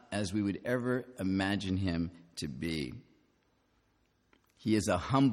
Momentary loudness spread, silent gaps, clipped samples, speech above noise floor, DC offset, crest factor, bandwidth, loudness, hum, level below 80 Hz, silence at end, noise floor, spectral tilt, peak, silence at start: 10 LU; none; under 0.1%; 41 dB; under 0.1%; 18 dB; 14 kHz; -34 LUFS; none; -58 dBFS; 0 s; -73 dBFS; -6 dB/octave; -16 dBFS; 0.1 s